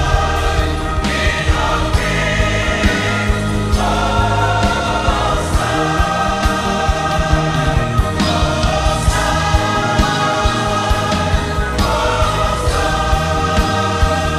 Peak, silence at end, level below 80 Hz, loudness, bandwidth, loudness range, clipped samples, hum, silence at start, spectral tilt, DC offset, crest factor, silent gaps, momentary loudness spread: 0 dBFS; 0 s; -20 dBFS; -16 LUFS; 15 kHz; 1 LU; under 0.1%; none; 0 s; -5 dB/octave; under 0.1%; 14 dB; none; 2 LU